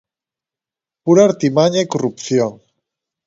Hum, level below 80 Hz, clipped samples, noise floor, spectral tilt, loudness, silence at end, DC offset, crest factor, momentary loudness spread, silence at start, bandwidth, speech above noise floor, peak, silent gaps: none; -62 dBFS; under 0.1%; -88 dBFS; -6 dB/octave; -15 LUFS; 0.7 s; under 0.1%; 18 dB; 10 LU; 1.05 s; 8 kHz; 74 dB; 0 dBFS; none